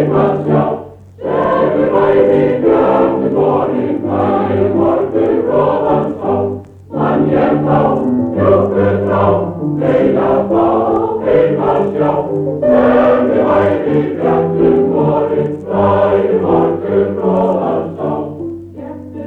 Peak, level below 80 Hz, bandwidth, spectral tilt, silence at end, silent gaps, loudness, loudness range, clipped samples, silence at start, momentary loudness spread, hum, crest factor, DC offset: 0 dBFS; -42 dBFS; 4.6 kHz; -10 dB/octave; 0 s; none; -13 LUFS; 2 LU; under 0.1%; 0 s; 7 LU; none; 12 dB; under 0.1%